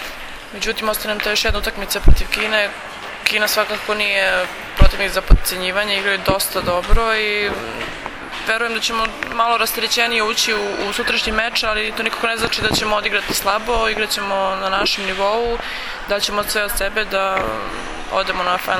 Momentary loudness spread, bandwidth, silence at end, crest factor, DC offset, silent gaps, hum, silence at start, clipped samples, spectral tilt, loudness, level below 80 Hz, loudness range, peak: 8 LU; 17 kHz; 0 s; 18 dB; under 0.1%; none; none; 0 s; under 0.1%; -3 dB/octave; -18 LUFS; -24 dBFS; 2 LU; 0 dBFS